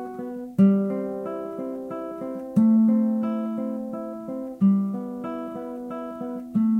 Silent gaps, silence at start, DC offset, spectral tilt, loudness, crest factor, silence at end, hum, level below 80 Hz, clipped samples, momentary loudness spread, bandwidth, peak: none; 0 s; under 0.1%; -10.5 dB/octave; -25 LUFS; 16 dB; 0 s; none; -66 dBFS; under 0.1%; 14 LU; 3.2 kHz; -8 dBFS